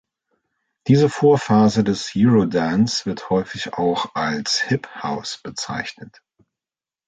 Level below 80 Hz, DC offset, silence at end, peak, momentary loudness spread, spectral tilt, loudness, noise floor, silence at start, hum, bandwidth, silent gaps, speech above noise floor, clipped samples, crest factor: -54 dBFS; under 0.1%; 1 s; -4 dBFS; 12 LU; -5.5 dB/octave; -19 LUFS; under -90 dBFS; 0.85 s; none; 9.2 kHz; none; over 71 dB; under 0.1%; 16 dB